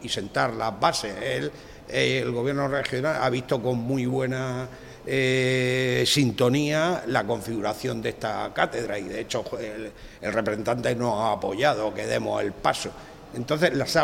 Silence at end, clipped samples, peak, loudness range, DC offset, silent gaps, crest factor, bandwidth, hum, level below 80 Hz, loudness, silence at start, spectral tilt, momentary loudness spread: 0 s; under 0.1%; -6 dBFS; 5 LU; under 0.1%; none; 20 dB; 16.5 kHz; none; -52 dBFS; -25 LUFS; 0 s; -5 dB/octave; 11 LU